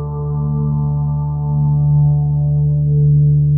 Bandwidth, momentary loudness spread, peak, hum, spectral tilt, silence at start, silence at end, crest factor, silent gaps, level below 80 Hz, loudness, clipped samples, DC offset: 1.3 kHz; 7 LU; -6 dBFS; none; -19.5 dB/octave; 0 s; 0 s; 8 dB; none; -30 dBFS; -15 LUFS; under 0.1%; under 0.1%